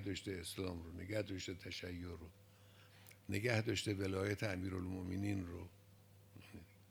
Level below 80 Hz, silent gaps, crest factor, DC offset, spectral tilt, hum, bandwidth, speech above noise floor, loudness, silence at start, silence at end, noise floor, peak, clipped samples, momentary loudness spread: -72 dBFS; none; 24 dB; under 0.1%; -5.5 dB/octave; none; over 20 kHz; 22 dB; -43 LUFS; 0 s; 0 s; -65 dBFS; -20 dBFS; under 0.1%; 22 LU